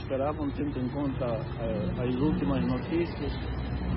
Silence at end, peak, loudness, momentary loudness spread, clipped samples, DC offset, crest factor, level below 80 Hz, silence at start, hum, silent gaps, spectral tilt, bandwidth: 0 s; -14 dBFS; -31 LUFS; 6 LU; under 0.1%; under 0.1%; 16 dB; -40 dBFS; 0 s; none; none; -11.5 dB/octave; 5.8 kHz